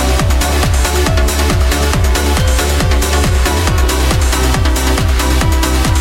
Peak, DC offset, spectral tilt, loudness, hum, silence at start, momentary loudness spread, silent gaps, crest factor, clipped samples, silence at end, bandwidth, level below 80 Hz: 0 dBFS; under 0.1%; -4.5 dB/octave; -13 LUFS; none; 0 s; 0 LU; none; 10 dB; under 0.1%; 0 s; 17 kHz; -14 dBFS